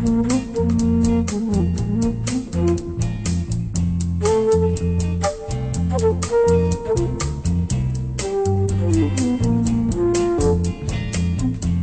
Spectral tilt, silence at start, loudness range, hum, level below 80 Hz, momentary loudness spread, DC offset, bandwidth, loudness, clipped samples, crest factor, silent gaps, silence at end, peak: -7 dB/octave; 0 s; 1 LU; none; -30 dBFS; 6 LU; 0.3%; 9.2 kHz; -20 LUFS; under 0.1%; 14 dB; none; 0 s; -4 dBFS